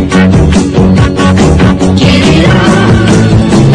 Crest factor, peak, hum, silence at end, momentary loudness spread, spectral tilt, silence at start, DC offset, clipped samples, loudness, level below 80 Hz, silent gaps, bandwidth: 4 dB; 0 dBFS; none; 0 s; 2 LU; -6.5 dB/octave; 0 s; under 0.1%; 4%; -6 LUFS; -18 dBFS; none; 10.5 kHz